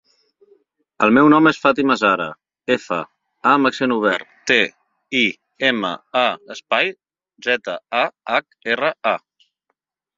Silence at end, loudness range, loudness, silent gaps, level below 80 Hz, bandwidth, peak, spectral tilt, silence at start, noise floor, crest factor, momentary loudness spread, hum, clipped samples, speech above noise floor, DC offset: 1 s; 5 LU; -18 LUFS; none; -62 dBFS; 7.6 kHz; 0 dBFS; -4.5 dB/octave; 1 s; -74 dBFS; 18 dB; 10 LU; none; under 0.1%; 56 dB; under 0.1%